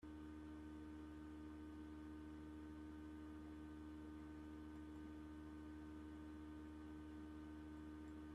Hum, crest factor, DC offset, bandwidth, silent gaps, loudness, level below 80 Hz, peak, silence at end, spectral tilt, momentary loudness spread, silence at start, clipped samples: none; 10 dB; under 0.1%; 13 kHz; none; -56 LUFS; -66 dBFS; -46 dBFS; 0 s; -7.5 dB/octave; 0 LU; 0 s; under 0.1%